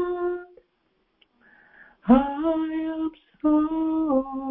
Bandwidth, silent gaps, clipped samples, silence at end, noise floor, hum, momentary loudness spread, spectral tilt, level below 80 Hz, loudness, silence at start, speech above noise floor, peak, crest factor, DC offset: 3.8 kHz; none; under 0.1%; 0 s; -70 dBFS; none; 12 LU; -11 dB/octave; -52 dBFS; -24 LUFS; 0 s; 48 dB; -4 dBFS; 20 dB; under 0.1%